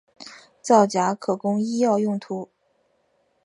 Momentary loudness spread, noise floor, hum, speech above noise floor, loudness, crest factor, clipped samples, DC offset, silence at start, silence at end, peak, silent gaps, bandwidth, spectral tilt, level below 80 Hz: 24 LU; -67 dBFS; none; 46 dB; -22 LUFS; 20 dB; under 0.1%; under 0.1%; 0.2 s; 1 s; -4 dBFS; none; 11 kHz; -5.5 dB/octave; -74 dBFS